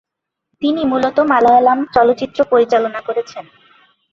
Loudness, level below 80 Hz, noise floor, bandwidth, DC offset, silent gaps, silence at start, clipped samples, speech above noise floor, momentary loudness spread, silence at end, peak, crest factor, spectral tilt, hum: -14 LUFS; -54 dBFS; -73 dBFS; 7.2 kHz; under 0.1%; none; 0.6 s; under 0.1%; 59 dB; 12 LU; 0.7 s; -2 dBFS; 14 dB; -5.5 dB/octave; none